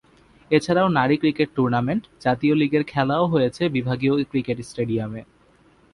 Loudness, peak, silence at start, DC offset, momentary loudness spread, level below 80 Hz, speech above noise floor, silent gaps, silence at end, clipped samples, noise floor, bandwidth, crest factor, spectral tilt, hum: -22 LUFS; -4 dBFS; 0.5 s; under 0.1%; 7 LU; -54 dBFS; 35 dB; none; 0.7 s; under 0.1%; -56 dBFS; 11.5 kHz; 18 dB; -7 dB/octave; none